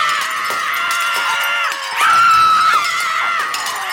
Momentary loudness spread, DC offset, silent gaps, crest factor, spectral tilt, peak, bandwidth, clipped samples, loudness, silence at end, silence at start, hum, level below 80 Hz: 8 LU; under 0.1%; none; 12 dB; 1 dB/octave; -2 dBFS; 17 kHz; under 0.1%; -14 LUFS; 0 s; 0 s; none; -60 dBFS